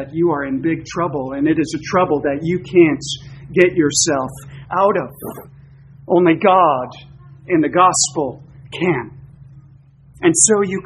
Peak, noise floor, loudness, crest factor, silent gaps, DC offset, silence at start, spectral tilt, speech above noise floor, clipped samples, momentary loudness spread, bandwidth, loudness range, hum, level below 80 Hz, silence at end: 0 dBFS; -46 dBFS; -16 LUFS; 18 dB; none; under 0.1%; 0 s; -4 dB/octave; 30 dB; under 0.1%; 16 LU; 12.5 kHz; 2 LU; none; -50 dBFS; 0.05 s